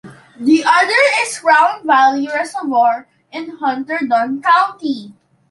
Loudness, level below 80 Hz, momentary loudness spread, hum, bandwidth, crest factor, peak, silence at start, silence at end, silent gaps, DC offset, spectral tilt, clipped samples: -14 LUFS; -68 dBFS; 12 LU; none; 11.5 kHz; 14 dB; -2 dBFS; 0.05 s; 0.4 s; none; under 0.1%; -2.5 dB/octave; under 0.1%